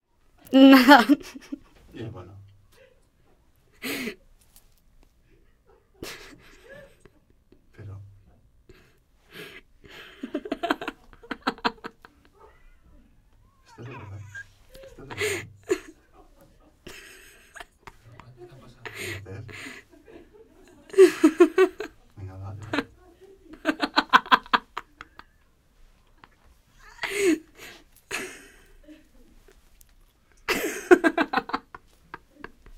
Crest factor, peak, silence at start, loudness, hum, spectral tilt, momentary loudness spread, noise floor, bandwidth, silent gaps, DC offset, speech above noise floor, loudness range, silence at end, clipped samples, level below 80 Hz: 26 dB; 0 dBFS; 0.5 s; -22 LUFS; none; -4 dB/octave; 27 LU; -61 dBFS; 16 kHz; none; under 0.1%; 44 dB; 23 LU; 1.2 s; under 0.1%; -58 dBFS